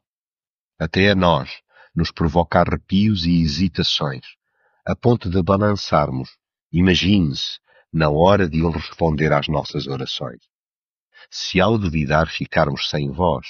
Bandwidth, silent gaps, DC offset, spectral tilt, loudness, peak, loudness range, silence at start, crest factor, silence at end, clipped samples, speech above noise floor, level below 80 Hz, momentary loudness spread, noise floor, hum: 7.2 kHz; 6.61-6.70 s, 10.50-11.11 s; under 0.1%; -5 dB/octave; -19 LUFS; -2 dBFS; 3 LU; 0.8 s; 18 dB; 0 s; under 0.1%; over 71 dB; -38 dBFS; 12 LU; under -90 dBFS; none